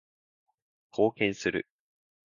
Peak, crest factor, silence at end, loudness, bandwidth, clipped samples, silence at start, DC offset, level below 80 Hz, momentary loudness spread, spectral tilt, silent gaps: -10 dBFS; 22 dB; 0.6 s; -30 LUFS; 7.4 kHz; under 0.1%; 0.95 s; under 0.1%; -66 dBFS; 13 LU; -5 dB/octave; none